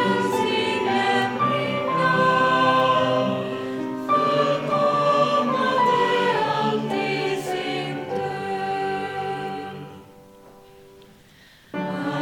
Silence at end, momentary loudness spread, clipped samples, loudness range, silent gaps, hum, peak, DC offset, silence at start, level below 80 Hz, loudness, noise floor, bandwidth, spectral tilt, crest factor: 0 s; 10 LU; under 0.1%; 10 LU; none; none; -6 dBFS; under 0.1%; 0 s; -64 dBFS; -22 LUFS; -51 dBFS; 18 kHz; -5.5 dB/octave; 16 dB